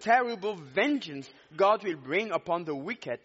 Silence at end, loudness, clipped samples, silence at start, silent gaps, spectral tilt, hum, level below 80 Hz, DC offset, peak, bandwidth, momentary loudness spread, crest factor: 0.1 s; -29 LUFS; under 0.1%; 0 s; none; -2.5 dB/octave; none; -76 dBFS; under 0.1%; -10 dBFS; 8 kHz; 11 LU; 18 dB